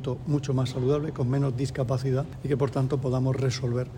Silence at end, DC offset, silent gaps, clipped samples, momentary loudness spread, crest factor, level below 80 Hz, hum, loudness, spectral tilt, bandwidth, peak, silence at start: 0 s; under 0.1%; none; under 0.1%; 3 LU; 14 dB; -50 dBFS; none; -27 LUFS; -7.5 dB/octave; 10 kHz; -12 dBFS; 0 s